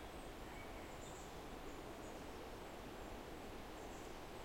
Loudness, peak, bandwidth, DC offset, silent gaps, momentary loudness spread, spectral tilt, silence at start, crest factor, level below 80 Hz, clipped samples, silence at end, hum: -53 LUFS; -38 dBFS; 16.5 kHz; under 0.1%; none; 1 LU; -4.5 dB/octave; 0 s; 14 dB; -58 dBFS; under 0.1%; 0 s; none